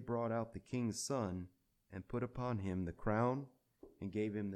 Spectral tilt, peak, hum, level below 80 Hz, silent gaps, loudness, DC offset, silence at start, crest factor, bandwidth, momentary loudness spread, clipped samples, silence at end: -6 dB/octave; -22 dBFS; none; -62 dBFS; none; -41 LUFS; under 0.1%; 0 s; 18 dB; 14 kHz; 14 LU; under 0.1%; 0 s